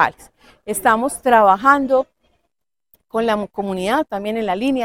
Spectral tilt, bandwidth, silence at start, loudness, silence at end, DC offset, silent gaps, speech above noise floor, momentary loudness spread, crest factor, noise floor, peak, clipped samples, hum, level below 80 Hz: -4 dB/octave; 17 kHz; 0 s; -17 LUFS; 0 s; under 0.1%; none; 59 dB; 13 LU; 18 dB; -76 dBFS; 0 dBFS; under 0.1%; none; -52 dBFS